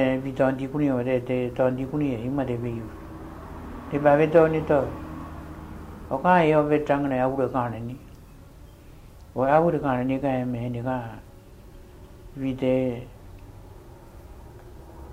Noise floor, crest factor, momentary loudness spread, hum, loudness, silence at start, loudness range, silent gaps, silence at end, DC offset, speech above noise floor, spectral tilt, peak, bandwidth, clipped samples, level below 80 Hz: -46 dBFS; 20 dB; 23 LU; none; -24 LUFS; 0 s; 9 LU; none; 0 s; under 0.1%; 23 dB; -8.5 dB/octave; -6 dBFS; 16 kHz; under 0.1%; -46 dBFS